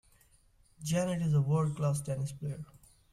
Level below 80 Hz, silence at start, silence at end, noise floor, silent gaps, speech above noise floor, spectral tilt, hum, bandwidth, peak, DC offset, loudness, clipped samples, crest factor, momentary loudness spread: -62 dBFS; 0.8 s; 0.45 s; -65 dBFS; none; 34 dB; -7 dB/octave; none; 13.5 kHz; -18 dBFS; under 0.1%; -32 LUFS; under 0.1%; 14 dB; 14 LU